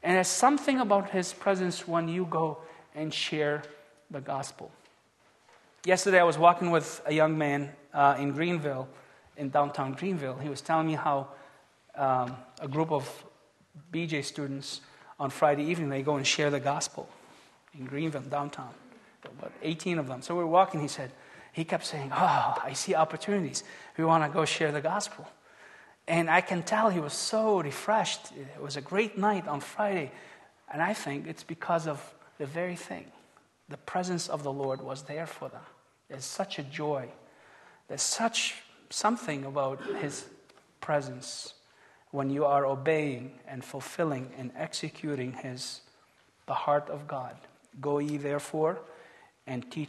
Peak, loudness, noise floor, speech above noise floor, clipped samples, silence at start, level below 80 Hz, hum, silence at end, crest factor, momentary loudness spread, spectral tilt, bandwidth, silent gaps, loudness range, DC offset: -6 dBFS; -30 LUFS; -65 dBFS; 35 dB; under 0.1%; 0.05 s; -76 dBFS; none; 0 s; 26 dB; 17 LU; -4.5 dB/octave; 12.5 kHz; none; 8 LU; under 0.1%